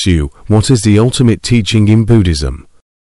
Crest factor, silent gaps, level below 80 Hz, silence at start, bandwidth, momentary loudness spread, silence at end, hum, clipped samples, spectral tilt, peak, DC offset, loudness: 10 dB; none; -24 dBFS; 0 s; 11.5 kHz; 8 LU; 0.5 s; none; under 0.1%; -6 dB/octave; 0 dBFS; under 0.1%; -11 LUFS